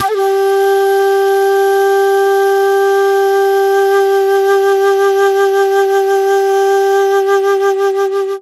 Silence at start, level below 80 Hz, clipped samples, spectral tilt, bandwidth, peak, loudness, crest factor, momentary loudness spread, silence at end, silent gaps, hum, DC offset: 0 s; -66 dBFS; under 0.1%; -2.5 dB/octave; 14 kHz; 0 dBFS; -11 LUFS; 10 dB; 2 LU; 0 s; none; none; under 0.1%